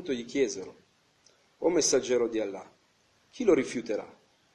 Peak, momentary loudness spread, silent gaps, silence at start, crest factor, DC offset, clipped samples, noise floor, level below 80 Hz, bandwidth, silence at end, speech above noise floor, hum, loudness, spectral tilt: -12 dBFS; 16 LU; none; 0 s; 20 dB; under 0.1%; under 0.1%; -67 dBFS; -66 dBFS; 12 kHz; 0.45 s; 39 dB; none; -29 LUFS; -3 dB/octave